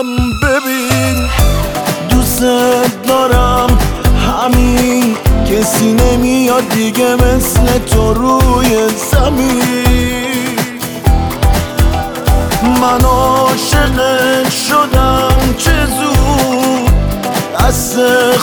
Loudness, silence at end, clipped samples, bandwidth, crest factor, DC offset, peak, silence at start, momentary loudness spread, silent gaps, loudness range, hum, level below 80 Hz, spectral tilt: -11 LUFS; 0 s; under 0.1%; over 20 kHz; 10 dB; under 0.1%; 0 dBFS; 0 s; 4 LU; none; 2 LU; none; -16 dBFS; -5 dB/octave